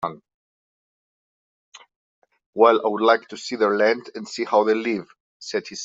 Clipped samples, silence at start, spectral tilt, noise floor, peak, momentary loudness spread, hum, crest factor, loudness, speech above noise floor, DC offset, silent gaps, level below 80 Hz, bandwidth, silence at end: under 0.1%; 0 s; -4 dB/octave; under -90 dBFS; -2 dBFS; 15 LU; none; 20 dB; -21 LUFS; over 70 dB; under 0.1%; 0.34-1.72 s, 1.96-2.22 s, 2.46-2.53 s, 5.20-5.40 s; -72 dBFS; 7.8 kHz; 0 s